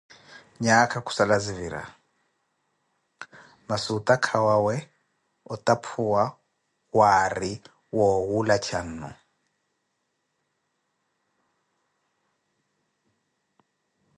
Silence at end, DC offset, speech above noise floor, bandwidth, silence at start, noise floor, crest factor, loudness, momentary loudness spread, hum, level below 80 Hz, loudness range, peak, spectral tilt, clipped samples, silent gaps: 5.05 s; under 0.1%; 53 dB; 11.5 kHz; 0.3 s; -76 dBFS; 22 dB; -24 LUFS; 19 LU; none; -58 dBFS; 6 LU; -4 dBFS; -4.5 dB/octave; under 0.1%; none